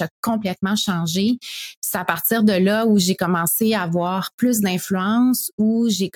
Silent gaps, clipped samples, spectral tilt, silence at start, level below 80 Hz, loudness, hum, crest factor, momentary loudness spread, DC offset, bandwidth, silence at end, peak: 0.11-0.23 s, 1.77-1.82 s, 4.33-4.38 s, 5.53-5.58 s; under 0.1%; -4.5 dB/octave; 0 s; -62 dBFS; -19 LUFS; none; 18 dB; 6 LU; under 0.1%; 18 kHz; 0.05 s; -2 dBFS